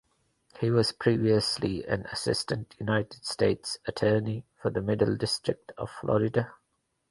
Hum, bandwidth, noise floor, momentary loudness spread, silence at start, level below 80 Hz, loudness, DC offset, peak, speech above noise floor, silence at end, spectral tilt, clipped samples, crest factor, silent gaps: none; 11.5 kHz; -77 dBFS; 9 LU; 0.55 s; -56 dBFS; -28 LUFS; under 0.1%; -10 dBFS; 49 dB; 0.55 s; -5.5 dB/octave; under 0.1%; 20 dB; none